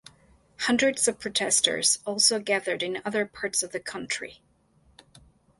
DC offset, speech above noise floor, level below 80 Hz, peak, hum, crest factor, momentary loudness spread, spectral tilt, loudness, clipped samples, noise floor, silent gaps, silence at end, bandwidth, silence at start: under 0.1%; 36 dB; -66 dBFS; -6 dBFS; none; 24 dB; 11 LU; -1 dB/octave; -25 LUFS; under 0.1%; -63 dBFS; none; 1.25 s; 12 kHz; 0.6 s